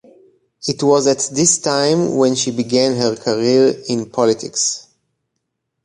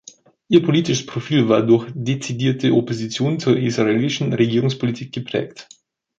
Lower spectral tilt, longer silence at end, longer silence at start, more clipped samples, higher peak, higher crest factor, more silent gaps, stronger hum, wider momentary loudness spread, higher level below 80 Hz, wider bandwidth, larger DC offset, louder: second, -3.5 dB/octave vs -6 dB/octave; first, 1.05 s vs 0.55 s; about the same, 0.6 s vs 0.5 s; neither; about the same, 0 dBFS vs -2 dBFS; about the same, 16 dB vs 18 dB; neither; neither; about the same, 7 LU vs 9 LU; about the same, -60 dBFS vs -58 dBFS; first, 11.5 kHz vs 7.8 kHz; neither; first, -16 LUFS vs -19 LUFS